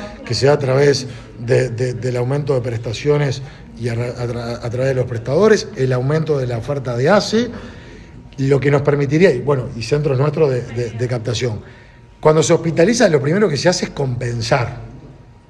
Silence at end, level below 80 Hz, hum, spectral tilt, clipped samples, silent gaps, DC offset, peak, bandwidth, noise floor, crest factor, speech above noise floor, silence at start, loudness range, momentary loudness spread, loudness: 0.3 s; -42 dBFS; none; -6 dB/octave; under 0.1%; none; under 0.1%; 0 dBFS; 11.5 kHz; -40 dBFS; 18 dB; 24 dB; 0 s; 4 LU; 11 LU; -17 LUFS